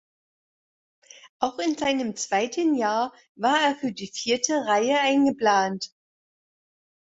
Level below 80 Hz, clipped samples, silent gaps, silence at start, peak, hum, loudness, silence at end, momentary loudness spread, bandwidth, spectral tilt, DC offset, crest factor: -70 dBFS; under 0.1%; 1.29-1.40 s, 3.29-3.35 s; 1.25 s; -8 dBFS; none; -24 LUFS; 1.25 s; 10 LU; 8 kHz; -3 dB/octave; under 0.1%; 18 dB